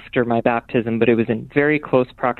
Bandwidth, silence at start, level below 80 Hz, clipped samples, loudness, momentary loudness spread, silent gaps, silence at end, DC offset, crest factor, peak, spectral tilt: 4.3 kHz; 0.05 s; -50 dBFS; under 0.1%; -19 LUFS; 3 LU; none; 0.05 s; under 0.1%; 16 dB; -2 dBFS; -9.5 dB/octave